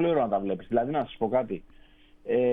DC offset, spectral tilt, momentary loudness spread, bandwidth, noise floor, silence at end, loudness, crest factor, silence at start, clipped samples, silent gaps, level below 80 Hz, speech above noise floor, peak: under 0.1%; -9.5 dB/octave; 11 LU; 3.8 kHz; -54 dBFS; 0 s; -28 LUFS; 16 dB; 0 s; under 0.1%; none; -56 dBFS; 28 dB; -12 dBFS